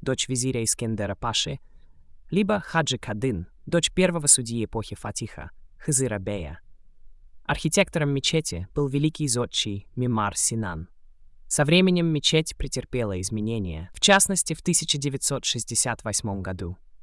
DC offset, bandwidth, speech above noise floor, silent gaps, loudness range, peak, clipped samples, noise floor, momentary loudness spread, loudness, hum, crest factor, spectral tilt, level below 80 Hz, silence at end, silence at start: under 0.1%; 12 kHz; 23 dB; none; 4 LU; -2 dBFS; under 0.1%; -48 dBFS; 14 LU; -24 LUFS; none; 24 dB; -3.5 dB/octave; -46 dBFS; 0 s; 0 s